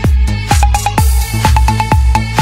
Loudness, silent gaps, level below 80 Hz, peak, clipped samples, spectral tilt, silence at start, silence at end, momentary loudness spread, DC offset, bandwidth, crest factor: -12 LUFS; none; -12 dBFS; 0 dBFS; under 0.1%; -5 dB/octave; 0 s; 0 s; 2 LU; under 0.1%; 16 kHz; 10 dB